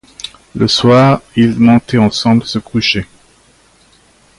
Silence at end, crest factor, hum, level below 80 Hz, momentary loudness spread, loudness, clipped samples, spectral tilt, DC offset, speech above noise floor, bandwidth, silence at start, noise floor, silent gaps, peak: 1.35 s; 12 dB; none; -42 dBFS; 18 LU; -11 LUFS; under 0.1%; -6 dB/octave; under 0.1%; 38 dB; 11.5 kHz; 0.25 s; -49 dBFS; none; 0 dBFS